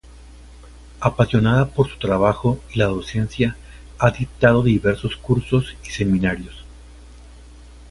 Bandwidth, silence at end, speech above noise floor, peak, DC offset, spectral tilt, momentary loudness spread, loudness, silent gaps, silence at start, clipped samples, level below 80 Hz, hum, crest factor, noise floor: 11.5 kHz; 0.6 s; 23 dB; 0 dBFS; under 0.1%; -7 dB/octave; 8 LU; -20 LUFS; none; 0.15 s; under 0.1%; -38 dBFS; none; 20 dB; -42 dBFS